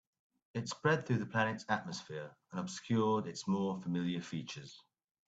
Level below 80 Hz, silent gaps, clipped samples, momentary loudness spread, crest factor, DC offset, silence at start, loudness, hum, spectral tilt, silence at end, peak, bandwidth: -76 dBFS; none; under 0.1%; 13 LU; 20 dB; under 0.1%; 0.55 s; -37 LUFS; none; -5.5 dB/octave; 0.5 s; -18 dBFS; 9 kHz